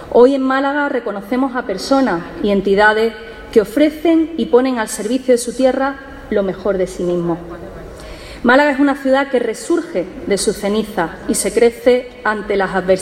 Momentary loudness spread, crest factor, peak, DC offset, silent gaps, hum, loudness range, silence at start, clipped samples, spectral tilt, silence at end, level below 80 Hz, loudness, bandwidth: 10 LU; 16 dB; 0 dBFS; under 0.1%; none; none; 3 LU; 0 s; under 0.1%; -4.5 dB/octave; 0 s; -42 dBFS; -16 LUFS; 16 kHz